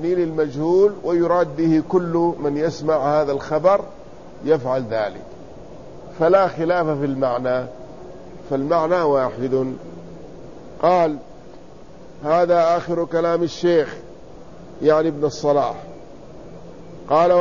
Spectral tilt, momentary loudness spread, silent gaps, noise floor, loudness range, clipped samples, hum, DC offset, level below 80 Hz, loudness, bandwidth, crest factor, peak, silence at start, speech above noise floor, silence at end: -7 dB/octave; 23 LU; none; -42 dBFS; 4 LU; under 0.1%; none; 0.8%; -50 dBFS; -19 LUFS; 7.4 kHz; 18 dB; -2 dBFS; 0 s; 24 dB; 0 s